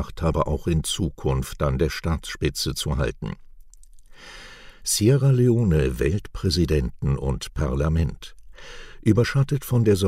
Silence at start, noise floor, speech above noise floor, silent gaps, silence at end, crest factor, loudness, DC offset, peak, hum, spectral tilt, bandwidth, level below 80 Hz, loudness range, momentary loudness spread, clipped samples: 0 s; -45 dBFS; 23 dB; none; 0 s; 18 dB; -23 LUFS; under 0.1%; -6 dBFS; none; -5.5 dB/octave; 16 kHz; -32 dBFS; 5 LU; 22 LU; under 0.1%